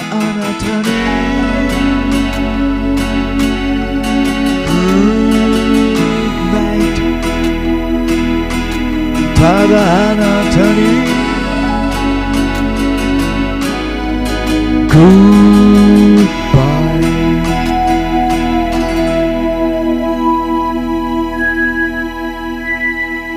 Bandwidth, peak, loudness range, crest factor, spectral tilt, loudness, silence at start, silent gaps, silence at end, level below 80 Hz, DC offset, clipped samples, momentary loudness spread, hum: 15.5 kHz; 0 dBFS; 6 LU; 12 dB; -6 dB/octave; -12 LUFS; 0 s; none; 0 s; -22 dBFS; under 0.1%; 0.2%; 9 LU; none